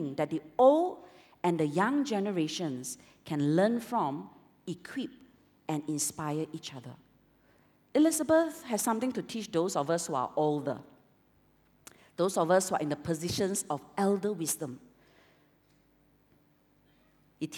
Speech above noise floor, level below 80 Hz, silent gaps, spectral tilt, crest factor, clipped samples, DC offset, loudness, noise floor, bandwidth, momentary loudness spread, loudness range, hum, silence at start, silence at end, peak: 37 dB; -72 dBFS; none; -5 dB/octave; 22 dB; under 0.1%; under 0.1%; -30 LUFS; -67 dBFS; 19 kHz; 16 LU; 7 LU; none; 0 s; 0 s; -10 dBFS